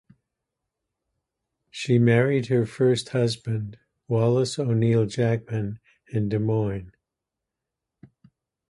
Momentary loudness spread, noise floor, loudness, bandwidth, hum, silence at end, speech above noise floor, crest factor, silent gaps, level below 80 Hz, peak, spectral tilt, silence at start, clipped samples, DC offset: 13 LU; -86 dBFS; -24 LUFS; 11.5 kHz; none; 1.8 s; 63 dB; 18 dB; none; -56 dBFS; -6 dBFS; -7 dB/octave; 1.75 s; under 0.1%; under 0.1%